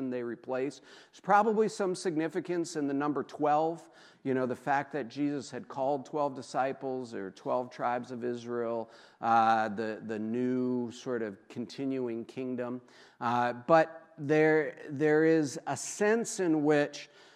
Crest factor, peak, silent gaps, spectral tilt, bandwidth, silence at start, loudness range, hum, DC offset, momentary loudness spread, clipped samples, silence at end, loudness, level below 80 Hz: 20 dB; -10 dBFS; none; -5.5 dB/octave; 13 kHz; 0 s; 6 LU; none; under 0.1%; 13 LU; under 0.1%; 0.3 s; -31 LUFS; -86 dBFS